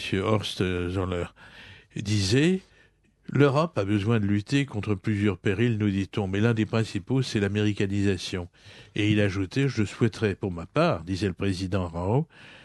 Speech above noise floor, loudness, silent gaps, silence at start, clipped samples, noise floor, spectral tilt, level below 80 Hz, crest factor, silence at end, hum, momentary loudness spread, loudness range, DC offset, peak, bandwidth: 35 dB; -26 LUFS; none; 0 s; under 0.1%; -61 dBFS; -6.5 dB/octave; -54 dBFS; 20 dB; 0.05 s; none; 8 LU; 2 LU; under 0.1%; -6 dBFS; 12 kHz